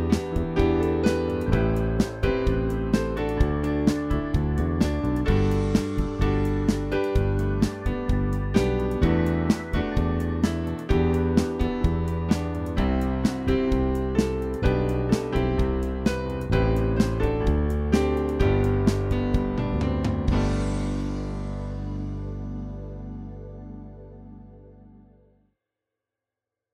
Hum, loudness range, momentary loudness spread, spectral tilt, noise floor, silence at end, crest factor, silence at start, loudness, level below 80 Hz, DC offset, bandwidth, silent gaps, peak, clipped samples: 50 Hz at -45 dBFS; 9 LU; 10 LU; -7.5 dB/octave; -88 dBFS; 2 s; 18 dB; 0 s; -25 LUFS; -30 dBFS; under 0.1%; 15.5 kHz; none; -6 dBFS; under 0.1%